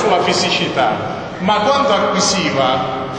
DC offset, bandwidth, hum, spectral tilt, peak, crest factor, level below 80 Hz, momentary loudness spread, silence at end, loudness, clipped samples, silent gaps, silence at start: under 0.1%; 10.5 kHz; none; -3.5 dB/octave; -2 dBFS; 14 dB; -48 dBFS; 6 LU; 0 s; -15 LUFS; under 0.1%; none; 0 s